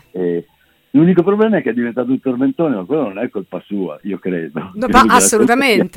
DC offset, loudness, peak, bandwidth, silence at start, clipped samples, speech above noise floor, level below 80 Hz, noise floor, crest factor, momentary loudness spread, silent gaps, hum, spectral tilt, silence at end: under 0.1%; -15 LUFS; 0 dBFS; 17 kHz; 0.15 s; under 0.1%; 41 dB; -42 dBFS; -55 dBFS; 16 dB; 14 LU; none; none; -4.5 dB/octave; 0 s